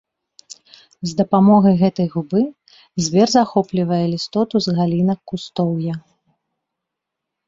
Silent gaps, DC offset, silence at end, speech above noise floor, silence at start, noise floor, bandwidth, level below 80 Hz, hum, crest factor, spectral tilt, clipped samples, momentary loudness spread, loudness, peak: none; under 0.1%; 1.5 s; 65 dB; 0.5 s; -81 dBFS; 7.8 kHz; -56 dBFS; none; 16 dB; -6.5 dB/octave; under 0.1%; 13 LU; -18 LUFS; -2 dBFS